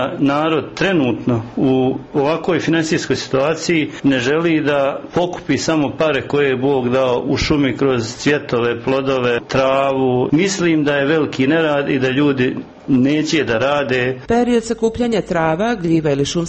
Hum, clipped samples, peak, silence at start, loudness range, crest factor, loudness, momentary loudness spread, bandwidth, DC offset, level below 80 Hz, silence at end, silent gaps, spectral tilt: none; under 0.1%; -4 dBFS; 0 s; 1 LU; 12 dB; -17 LUFS; 3 LU; 8.4 kHz; under 0.1%; -44 dBFS; 0 s; none; -5.5 dB/octave